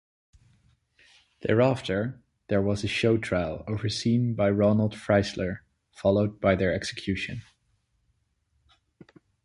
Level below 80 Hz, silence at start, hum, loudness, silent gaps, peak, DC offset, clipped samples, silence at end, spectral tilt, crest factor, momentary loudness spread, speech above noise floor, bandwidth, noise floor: -50 dBFS; 1.4 s; none; -26 LUFS; none; -8 dBFS; under 0.1%; under 0.1%; 2 s; -6.5 dB/octave; 20 dB; 9 LU; 47 dB; 11.5 kHz; -72 dBFS